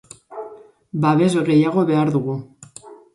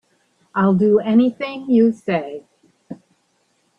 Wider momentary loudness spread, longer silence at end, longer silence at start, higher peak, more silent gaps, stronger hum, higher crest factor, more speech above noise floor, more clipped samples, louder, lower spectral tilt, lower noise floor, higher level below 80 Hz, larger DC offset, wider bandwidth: about the same, 22 LU vs 24 LU; second, 0.2 s vs 0.85 s; second, 0.3 s vs 0.55 s; about the same, -4 dBFS vs -4 dBFS; neither; neither; about the same, 16 dB vs 16 dB; second, 26 dB vs 48 dB; neither; about the same, -18 LUFS vs -17 LUFS; second, -7.5 dB/octave vs -9 dB/octave; second, -43 dBFS vs -64 dBFS; about the same, -62 dBFS vs -64 dBFS; neither; first, 11.5 kHz vs 5.4 kHz